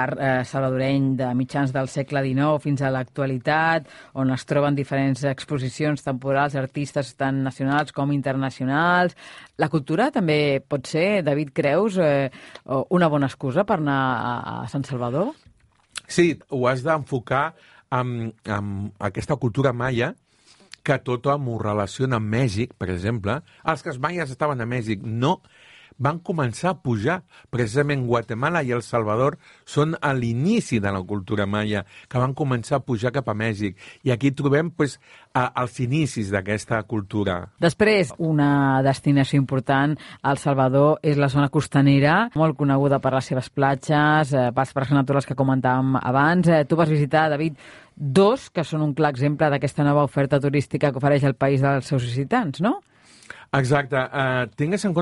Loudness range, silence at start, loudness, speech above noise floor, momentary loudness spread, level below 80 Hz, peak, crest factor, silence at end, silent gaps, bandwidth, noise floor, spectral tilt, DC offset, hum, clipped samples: 5 LU; 0 s; -22 LUFS; 33 dB; 8 LU; -54 dBFS; -6 dBFS; 16 dB; 0 s; none; 11.5 kHz; -55 dBFS; -7 dB/octave; under 0.1%; none; under 0.1%